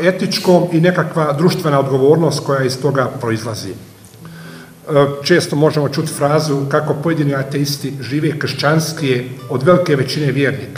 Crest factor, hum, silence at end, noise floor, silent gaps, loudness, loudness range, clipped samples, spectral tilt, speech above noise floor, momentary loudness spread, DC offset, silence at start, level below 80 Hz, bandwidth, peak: 16 dB; none; 0 s; -36 dBFS; none; -15 LUFS; 3 LU; under 0.1%; -6 dB/octave; 21 dB; 10 LU; under 0.1%; 0 s; -56 dBFS; 16 kHz; 0 dBFS